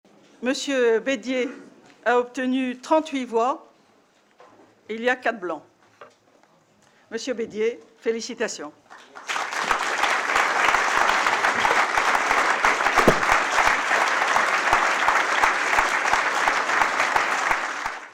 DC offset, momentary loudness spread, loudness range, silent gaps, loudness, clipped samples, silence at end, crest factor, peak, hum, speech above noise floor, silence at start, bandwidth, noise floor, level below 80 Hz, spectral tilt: under 0.1%; 10 LU; 11 LU; none; -21 LUFS; under 0.1%; 0.05 s; 18 dB; -6 dBFS; none; 35 dB; 0.4 s; 16.5 kHz; -59 dBFS; -50 dBFS; -2 dB/octave